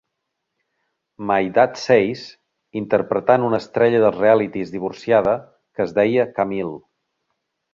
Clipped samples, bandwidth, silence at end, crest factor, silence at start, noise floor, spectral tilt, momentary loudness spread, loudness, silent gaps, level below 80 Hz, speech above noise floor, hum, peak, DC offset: under 0.1%; 7.6 kHz; 0.95 s; 18 dB; 1.2 s; -78 dBFS; -6.5 dB/octave; 15 LU; -19 LUFS; none; -58 dBFS; 60 dB; none; -2 dBFS; under 0.1%